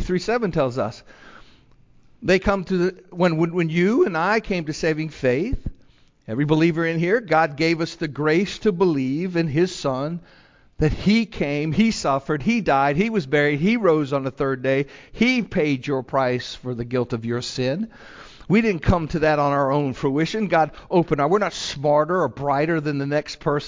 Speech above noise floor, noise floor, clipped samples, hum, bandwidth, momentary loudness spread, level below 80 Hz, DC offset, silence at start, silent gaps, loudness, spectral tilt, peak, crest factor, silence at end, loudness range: 32 dB; -53 dBFS; under 0.1%; none; 7.6 kHz; 7 LU; -42 dBFS; under 0.1%; 0 s; none; -21 LUFS; -6.5 dB/octave; -4 dBFS; 18 dB; 0 s; 3 LU